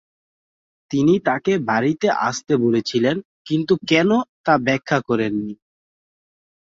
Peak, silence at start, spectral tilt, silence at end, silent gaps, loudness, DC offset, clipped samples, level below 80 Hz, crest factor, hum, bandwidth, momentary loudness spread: -2 dBFS; 0.9 s; -5.5 dB/octave; 1.15 s; 3.25-3.45 s, 4.29-4.44 s; -19 LUFS; under 0.1%; under 0.1%; -60 dBFS; 18 dB; none; 7.8 kHz; 7 LU